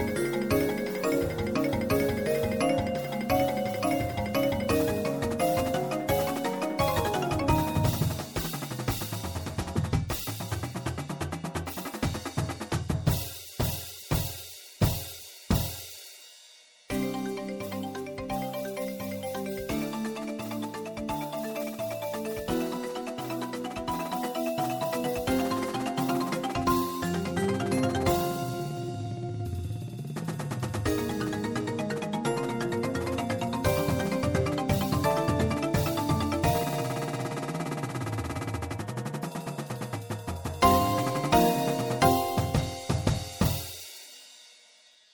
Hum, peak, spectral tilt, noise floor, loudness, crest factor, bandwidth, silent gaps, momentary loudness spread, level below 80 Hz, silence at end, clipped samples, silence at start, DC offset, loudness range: none; -6 dBFS; -5.5 dB/octave; -58 dBFS; -30 LUFS; 22 dB; over 20 kHz; none; 9 LU; -46 dBFS; 0.6 s; under 0.1%; 0 s; under 0.1%; 7 LU